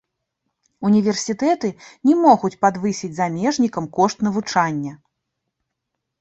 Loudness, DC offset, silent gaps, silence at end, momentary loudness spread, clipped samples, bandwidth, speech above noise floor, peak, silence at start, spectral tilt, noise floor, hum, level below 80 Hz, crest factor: -19 LUFS; under 0.1%; none; 1.25 s; 9 LU; under 0.1%; 8.2 kHz; 60 dB; 0 dBFS; 0.8 s; -5.5 dB/octave; -79 dBFS; none; -62 dBFS; 20 dB